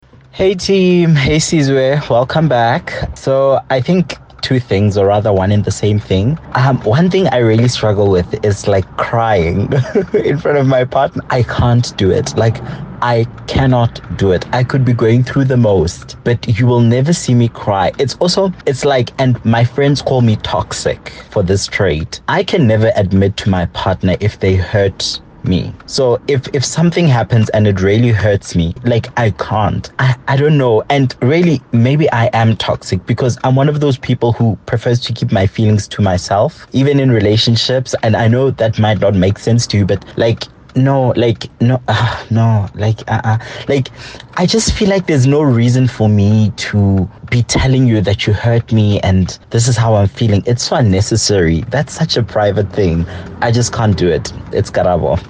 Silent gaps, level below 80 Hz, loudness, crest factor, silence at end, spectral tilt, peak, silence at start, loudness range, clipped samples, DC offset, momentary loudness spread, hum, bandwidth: none; -36 dBFS; -13 LUFS; 10 dB; 0 s; -6 dB/octave; -2 dBFS; 0.35 s; 2 LU; under 0.1%; under 0.1%; 6 LU; none; 9.6 kHz